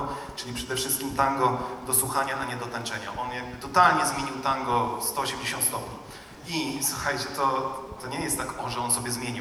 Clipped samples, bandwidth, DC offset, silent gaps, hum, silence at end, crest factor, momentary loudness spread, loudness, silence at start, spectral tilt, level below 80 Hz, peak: under 0.1%; over 20 kHz; under 0.1%; none; none; 0 s; 22 dB; 11 LU; -27 LUFS; 0 s; -2.5 dB/octave; -52 dBFS; -6 dBFS